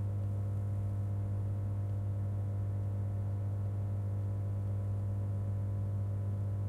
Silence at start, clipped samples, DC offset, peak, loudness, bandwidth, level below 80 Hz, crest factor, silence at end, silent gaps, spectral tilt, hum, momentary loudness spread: 0 s; under 0.1%; under 0.1%; -28 dBFS; -36 LUFS; 2.3 kHz; -52 dBFS; 8 dB; 0 s; none; -10 dB/octave; none; 0 LU